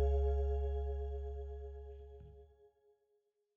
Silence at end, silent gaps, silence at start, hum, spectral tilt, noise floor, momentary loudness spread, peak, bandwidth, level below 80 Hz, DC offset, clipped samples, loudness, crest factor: 1.1 s; none; 0 s; none; -9.5 dB/octave; -80 dBFS; 21 LU; -24 dBFS; 3.6 kHz; -40 dBFS; under 0.1%; under 0.1%; -40 LUFS; 14 dB